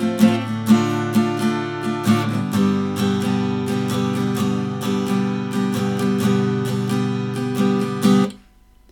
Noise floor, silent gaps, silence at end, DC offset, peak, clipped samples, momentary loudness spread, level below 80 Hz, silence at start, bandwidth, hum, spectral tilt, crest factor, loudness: -50 dBFS; none; 0.55 s; under 0.1%; -2 dBFS; under 0.1%; 6 LU; -58 dBFS; 0 s; 18 kHz; none; -6.5 dB/octave; 18 dB; -20 LUFS